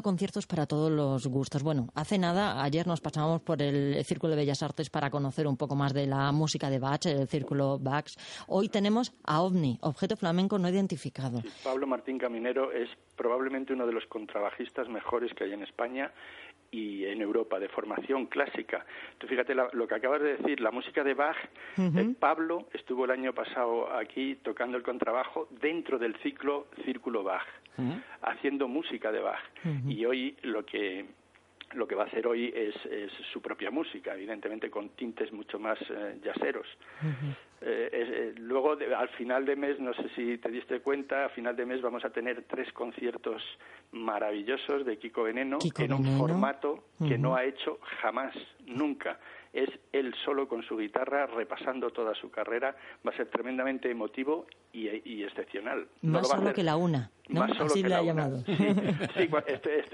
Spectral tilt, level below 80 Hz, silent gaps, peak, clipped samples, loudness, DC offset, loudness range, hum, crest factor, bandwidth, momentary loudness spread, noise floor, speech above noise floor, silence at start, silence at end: -6.5 dB/octave; -70 dBFS; none; -10 dBFS; under 0.1%; -32 LUFS; under 0.1%; 5 LU; none; 22 dB; 11.5 kHz; 10 LU; -55 dBFS; 24 dB; 0 s; 0 s